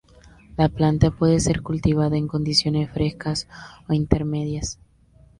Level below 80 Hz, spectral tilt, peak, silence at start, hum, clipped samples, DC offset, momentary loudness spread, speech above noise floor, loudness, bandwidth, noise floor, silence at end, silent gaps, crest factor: -36 dBFS; -6 dB/octave; 0 dBFS; 0.55 s; none; under 0.1%; under 0.1%; 12 LU; 32 dB; -22 LUFS; 11.5 kHz; -53 dBFS; 0.65 s; none; 22 dB